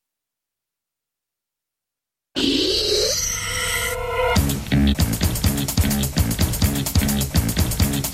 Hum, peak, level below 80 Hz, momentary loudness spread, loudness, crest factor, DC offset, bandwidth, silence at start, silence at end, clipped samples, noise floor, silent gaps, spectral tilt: none; -4 dBFS; -28 dBFS; 4 LU; -20 LUFS; 16 dB; under 0.1%; 16.5 kHz; 2.35 s; 0 s; under 0.1%; -86 dBFS; none; -4 dB/octave